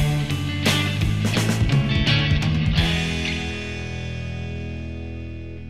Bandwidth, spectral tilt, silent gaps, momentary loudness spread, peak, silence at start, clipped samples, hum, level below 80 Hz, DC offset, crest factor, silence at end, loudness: 15.5 kHz; -5 dB/octave; none; 13 LU; -6 dBFS; 0 s; under 0.1%; none; -32 dBFS; 0.8%; 16 dB; 0 s; -22 LUFS